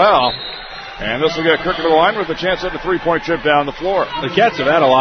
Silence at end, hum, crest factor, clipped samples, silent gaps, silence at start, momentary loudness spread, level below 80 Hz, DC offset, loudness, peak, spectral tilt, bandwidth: 0 s; none; 16 dB; under 0.1%; none; 0 s; 10 LU; -40 dBFS; under 0.1%; -16 LUFS; 0 dBFS; -5.5 dB/octave; 6.4 kHz